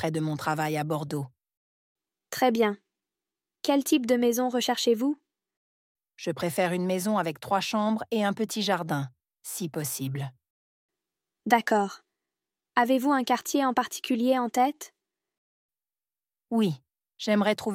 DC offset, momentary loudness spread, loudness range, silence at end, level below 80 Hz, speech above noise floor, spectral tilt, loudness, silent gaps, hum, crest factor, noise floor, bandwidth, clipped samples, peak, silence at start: under 0.1%; 12 LU; 4 LU; 0 s; -74 dBFS; over 64 dB; -4.5 dB/octave; -27 LUFS; 1.57-1.96 s, 5.57-5.95 s, 10.50-10.89 s, 15.37-15.69 s; none; 22 dB; under -90 dBFS; 16.5 kHz; under 0.1%; -6 dBFS; 0 s